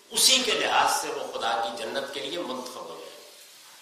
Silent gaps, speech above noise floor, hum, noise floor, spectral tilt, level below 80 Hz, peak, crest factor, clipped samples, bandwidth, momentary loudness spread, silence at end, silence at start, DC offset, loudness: none; 24 dB; none; -50 dBFS; 0.5 dB/octave; -68 dBFS; -4 dBFS; 24 dB; under 0.1%; 15 kHz; 22 LU; 0 s; 0.1 s; under 0.1%; -25 LUFS